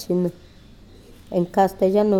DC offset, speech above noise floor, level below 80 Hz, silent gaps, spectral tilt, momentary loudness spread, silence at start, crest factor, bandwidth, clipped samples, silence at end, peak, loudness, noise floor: under 0.1%; 26 dB; -50 dBFS; none; -7.5 dB/octave; 9 LU; 0 s; 16 dB; 17 kHz; under 0.1%; 0 s; -6 dBFS; -22 LUFS; -46 dBFS